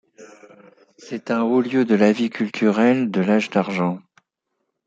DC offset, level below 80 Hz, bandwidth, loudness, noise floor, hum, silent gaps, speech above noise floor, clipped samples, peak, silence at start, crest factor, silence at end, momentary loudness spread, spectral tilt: under 0.1%; -68 dBFS; 7.8 kHz; -19 LUFS; -76 dBFS; none; none; 58 dB; under 0.1%; -2 dBFS; 0.2 s; 20 dB; 0.9 s; 8 LU; -7 dB/octave